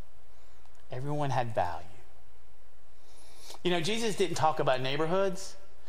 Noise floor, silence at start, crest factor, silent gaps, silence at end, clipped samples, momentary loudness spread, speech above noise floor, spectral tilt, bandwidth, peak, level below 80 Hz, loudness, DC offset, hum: -60 dBFS; 0.9 s; 20 dB; none; 0.25 s; under 0.1%; 16 LU; 30 dB; -5 dB/octave; 16 kHz; -12 dBFS; -60 dBFS; -31 LUFS; 3%; none